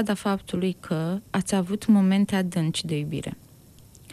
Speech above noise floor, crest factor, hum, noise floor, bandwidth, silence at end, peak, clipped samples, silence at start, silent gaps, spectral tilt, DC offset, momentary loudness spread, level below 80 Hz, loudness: 27 dB; 16 dB; none; -51 dBFS; 14 kHz; 0 s; -10 dBFS; under 0.1%; 0 s; none; -6 dB/octave; under 0.1%; 11 LU; -56 dBFS; -25 LUFS